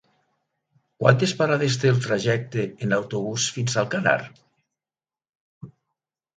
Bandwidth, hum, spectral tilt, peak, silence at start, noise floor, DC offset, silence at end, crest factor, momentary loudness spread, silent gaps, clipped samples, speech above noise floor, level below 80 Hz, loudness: 9.4 kHz; none; -5 dB/octave; -2 dBFS; 1 s; under -90 dBFS; under 0.1%; 0.65 s; 24 dB; 7 LU; 5.29-5.61 s; under 0.1%; over 68 dB; -62 dBFS; -23 LUFS